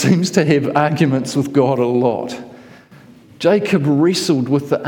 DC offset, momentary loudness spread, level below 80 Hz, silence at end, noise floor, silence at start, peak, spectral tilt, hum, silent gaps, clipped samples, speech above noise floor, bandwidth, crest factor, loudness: under 0.1%; 5 LU; -60 dBFS; 0 s; -43 dBFS; 0 s; -2 dBFS; -6 dB/octave; none; none; under 0.1%; 28 dB; 17.5 kHz; 14 dB; -16 LUFS